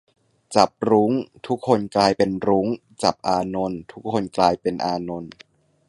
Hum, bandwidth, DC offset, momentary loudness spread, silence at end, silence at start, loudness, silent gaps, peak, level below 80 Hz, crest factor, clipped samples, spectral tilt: none; 11.5 kHz; under 0.1%; 10 LU; 0.6 s; 0.5 s; -22 LUFS; none; 0 dBFS; -54 dBFS; 22 dB; under 0.1%; -5.5 dB/octave